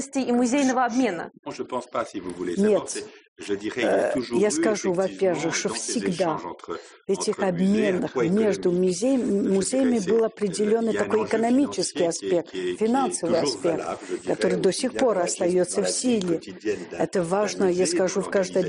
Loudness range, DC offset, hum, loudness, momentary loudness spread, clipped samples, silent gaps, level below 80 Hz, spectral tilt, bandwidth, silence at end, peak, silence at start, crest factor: 3 LU; under 0.1%; none; -24 LUFS; 9 LU; under 0.1%; 1.39-1.43 s, 3.28-3.36 s; -62 dBFS; -4.5 dB/octave; 10.5 kHz; 0 s; -6 dBFS; 0 s; 16 dB